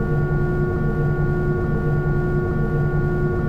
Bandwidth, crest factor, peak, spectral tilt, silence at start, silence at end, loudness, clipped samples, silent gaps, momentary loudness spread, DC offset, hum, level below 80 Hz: 4.9 kHz; 10 dB; -10 dBFS; -10.5 dB/octave; 0 s; 0 s; -21 LUFS; under 0.1%; none; 1 LU; under 0.1%; none; -28 dBFS